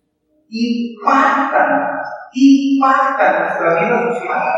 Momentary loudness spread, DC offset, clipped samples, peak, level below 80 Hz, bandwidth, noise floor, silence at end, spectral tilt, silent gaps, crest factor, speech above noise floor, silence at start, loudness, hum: 10 LU; under 0.1%; under 0.1%; 0 dBFS; -76 dBFS; 7.8 kHz; -61 dBFS; 0 s; -5.5 dB/octave; none; 14 dB; 47 dB; 0.5 s; -14 LUFS; none